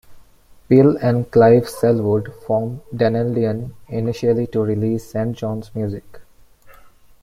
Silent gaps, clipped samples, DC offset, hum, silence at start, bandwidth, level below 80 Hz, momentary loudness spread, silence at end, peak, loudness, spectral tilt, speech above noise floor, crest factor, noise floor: none; under 0.1%; under 0.1%; none; 0.1 s; 15 kHz; -50 dBFS; 13 LU; 0.35 s; -2 dBFS; -18 LUFS; -8.5 dB/octave; 31 dB; 16 dB; -48 dBFS